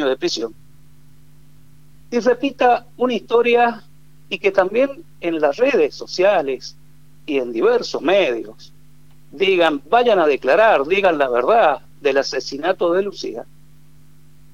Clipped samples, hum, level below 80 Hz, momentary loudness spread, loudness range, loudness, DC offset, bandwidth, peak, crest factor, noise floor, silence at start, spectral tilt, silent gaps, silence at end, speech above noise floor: under 0.1%; none; -58 dBFS; 13 LU; 4 LU; -18 LUFS; 0.8%; 12 kHz; -2 dBFS; 18 dB; -50 dBFS; 0 s; -4 dB/octave; none; 1.1 s; 33 dB